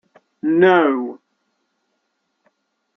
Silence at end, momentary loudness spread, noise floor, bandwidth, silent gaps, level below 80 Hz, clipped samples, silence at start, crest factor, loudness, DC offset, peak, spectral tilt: 1.8 s; 14 LU; -72 dBFS; 6 kHz; none; -68 dBFS; under 0.1%; 0.45 s; 18 dB; -16 LUFS; under 0.1%; -2 dBFS; -8 dB/octave